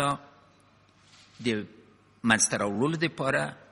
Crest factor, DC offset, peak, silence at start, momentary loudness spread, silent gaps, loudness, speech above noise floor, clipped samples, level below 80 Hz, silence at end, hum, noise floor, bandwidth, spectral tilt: 26 dB; under 0.1%; -4 dBFS; 0 s; 11 LU; none; -27 LUFS; 33 dB; under 0.1%; -64 dBFS; 0.15 s; none; -61 dBFS; 11.5 kHz; -3.5 dB/octave